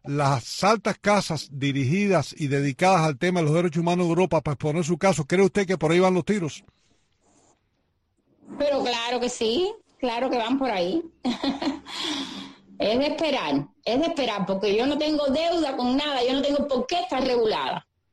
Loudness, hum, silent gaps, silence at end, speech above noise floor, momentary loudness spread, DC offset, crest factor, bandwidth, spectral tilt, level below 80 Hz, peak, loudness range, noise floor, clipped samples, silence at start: -24 LUFS; none; none; 0.3 s; 48 dB; 8 LU; under 0.1%; 18 dB; 12.5 kHz; -5.5 dB/octave; -54 dBFS; -6 dBFS; 5 LU; -71 dBFS; under 0.1%; 0.05 s